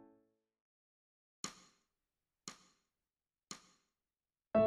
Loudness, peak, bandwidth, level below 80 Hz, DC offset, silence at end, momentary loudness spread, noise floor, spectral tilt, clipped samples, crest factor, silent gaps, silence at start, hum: -47 LUFS; -20 dBFS; 13.5 kHz; -74 dBFS; under 0.1%; 0 s; 17 LU; under -90 dBFS; -4.5 dB/octave; under 0.1%; 24 dB; none; 1.45 s; none